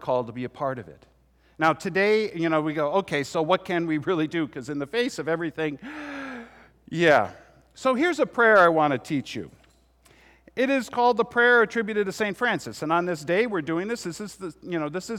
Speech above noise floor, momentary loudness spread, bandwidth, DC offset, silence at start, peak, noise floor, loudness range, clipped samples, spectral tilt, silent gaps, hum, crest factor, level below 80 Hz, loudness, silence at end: 35 dB; 16 LU; 15.5 kHz; under 0.1%; 0 s; -6 dBFS; -59 dBFS; 5 LU; under 0.1%; -5 dB/octave; none; none; 18 dB; -62 dBFS; -24 LUFS; 0 s